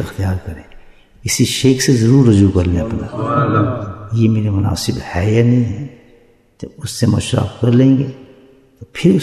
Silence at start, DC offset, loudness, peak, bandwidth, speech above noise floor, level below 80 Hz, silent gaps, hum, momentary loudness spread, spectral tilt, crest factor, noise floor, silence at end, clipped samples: 0 s; under 0.1%; -15 LUFS; 0 dBFS; 14 kHz; 35 dB; -40 dBFS; none; none; 16 LU; -6 dB/octave; 14 dB; -49 dBFS; 0 s; under 0.1%